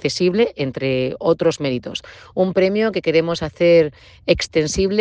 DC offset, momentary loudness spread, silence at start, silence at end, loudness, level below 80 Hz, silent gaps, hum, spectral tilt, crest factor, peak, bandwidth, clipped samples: under 0.1%; 10 LU; 0.05 s; 0 s; -18 LUFS; -44 dBFS; none; none; -5 dB/octave; 18 dB; -2 dBFS; 9.6 kHz; under 0.1%